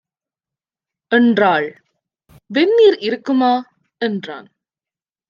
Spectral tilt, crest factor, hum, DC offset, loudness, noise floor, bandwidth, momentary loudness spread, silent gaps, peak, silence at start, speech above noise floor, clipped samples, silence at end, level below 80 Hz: -6.5 dB/octave; 16 dB; none; under 0.1%; -16 LUFS; under -90 dBFS; 7.2 kHz; 15 LU; none; -2 dBFS; 1.1 s; over 75 dB; under 0.1%; 0.9 s; -68 dBFS